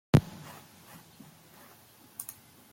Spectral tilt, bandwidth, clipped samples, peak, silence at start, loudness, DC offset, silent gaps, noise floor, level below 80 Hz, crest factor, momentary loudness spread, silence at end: -6.5 dB/octave; 17 kHz; under 0.1%; -6 dBFS; 0.15 s; -32 LUFS; under 0.1%; none; -57 dBFS; -56 dBFS; 28 dB; 25 LU; 0.5 s